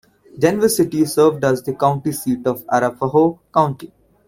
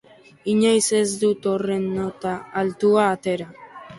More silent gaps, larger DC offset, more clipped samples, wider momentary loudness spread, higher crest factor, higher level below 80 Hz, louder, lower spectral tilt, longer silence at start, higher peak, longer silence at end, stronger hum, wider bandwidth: neither; neither; neither; second, 6 LU vs 11 LU; about the same, 16 dB vs 16 dB; first, -54 dBFS vs -60 dBFS; first, -18 LUFS vs -21 LUFS; about the same, -5.5 dB/octave vs -4.5 dB/octave; about the same, 0.35 s vs 0.45 s; first, -2 dBFS vs -6 dBFS; first, 0.4 s vs 0 s; neither; first, 16.5 kHz vs 11.5 kHz